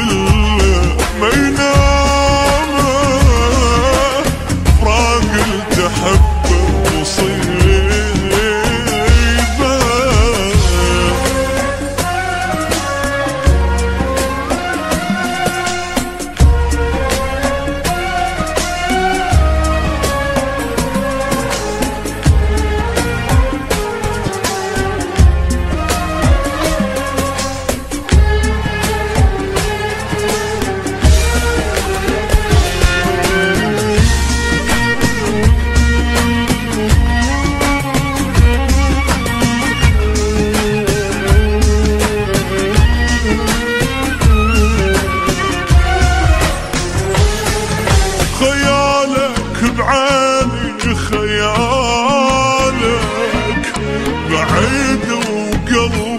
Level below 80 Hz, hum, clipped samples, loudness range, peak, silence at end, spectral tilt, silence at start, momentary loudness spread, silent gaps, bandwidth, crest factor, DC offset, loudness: -18 dBFS; none; under 0.1%; 3 LU; 0 dBFS; 0 s; -5 dB/octave; 0 s; 6 LU; none; 13.5 kHz; 12 dB; under 0.1%; -14 LUFS